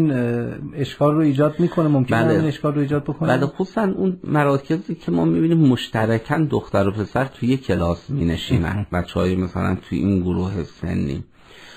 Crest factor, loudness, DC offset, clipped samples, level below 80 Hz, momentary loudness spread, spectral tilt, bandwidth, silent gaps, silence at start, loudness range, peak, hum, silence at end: 16 dB; -20 LUFS; under 0.1%; under 0.1%; -42 dBFS; 7 LU; -8 dB/octave; 14.5 kHz; none; 0 s; 3 LU; -4 dBFS; none; 0 s